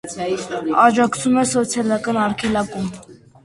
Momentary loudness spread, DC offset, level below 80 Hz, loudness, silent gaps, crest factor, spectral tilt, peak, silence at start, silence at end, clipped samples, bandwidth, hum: 10 LU; under 0.1%; -52 dBFS; -19 LUFS; none; 18 dB; -4.5 dB/octave; 0 dBFS; 0.05 s; 0.3 s; under 0.1%; 11.5 kHz; none